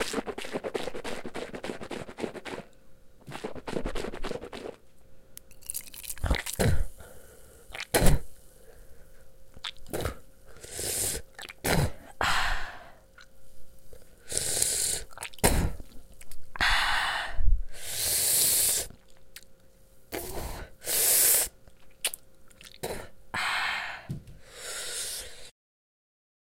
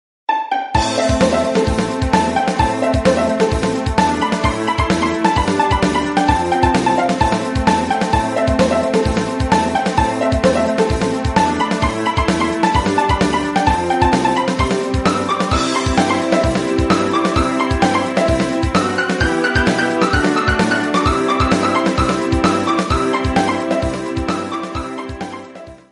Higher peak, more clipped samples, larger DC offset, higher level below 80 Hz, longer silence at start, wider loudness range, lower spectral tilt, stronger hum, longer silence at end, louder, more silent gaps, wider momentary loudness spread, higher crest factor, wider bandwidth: second, -4 dBFS vs 0 dBFS; neither; neither; second, -38 dBFS vs -28 dBFS; second, 0 s vs 0.3 s; first, 12 LU vs 1 LU; second, -2 dB/octave vs -5.5 dB/octave; neither; first, 1 s vs 0.15 s; second, -29 LUFS vs -16 LUFS; neither; first, 21 LU vs 3 LU; first, 26 dB vs 16 dB; first, 17 kHz vs 11.5 kHz